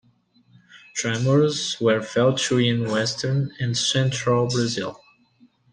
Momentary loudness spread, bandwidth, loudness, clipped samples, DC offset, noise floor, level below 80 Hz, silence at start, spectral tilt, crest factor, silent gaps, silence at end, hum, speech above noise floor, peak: 6 LU; 10 kHz; -22 LUFS; under 0.1%; under 0.1%; -60 dBFS; -60 dBFS; 0.75 s; -4.5 dB/octave; 16 dB; none; 0.8 s; none; 38 dB; -8 dBFS